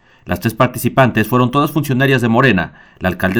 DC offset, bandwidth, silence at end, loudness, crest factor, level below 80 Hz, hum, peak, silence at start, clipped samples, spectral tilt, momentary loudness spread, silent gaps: under 0.1%; 19 kHz; 0 s; -15 LUFS; 14 dB; -42 dBFS; none; 0 dBFS; 0.25 s; under 0.1%; -6.5 dB/octave; 9 LU; none